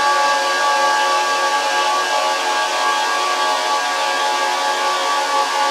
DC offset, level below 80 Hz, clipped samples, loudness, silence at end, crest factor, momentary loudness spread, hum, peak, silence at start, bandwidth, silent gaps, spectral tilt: under 0.1%; -88 dBFS; under 0.1%; -17 LUFS; 0 s; 14 dB; 2 LU; none; -4 dBFS; 0 s; 16 kHz; none; 1 dB/octave